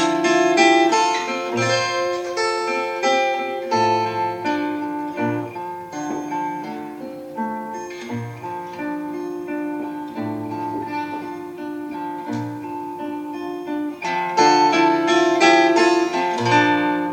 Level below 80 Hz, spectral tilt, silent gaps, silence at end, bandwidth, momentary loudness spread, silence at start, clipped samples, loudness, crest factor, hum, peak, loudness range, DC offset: -68 dBFS; -4 dB/octave; none; 0 s; 16 kHz; 15 LU; 0 s; under 0.1%; -20 LUFS; 18 dB; none; -2 dBFS; 11 LU; under 0.1%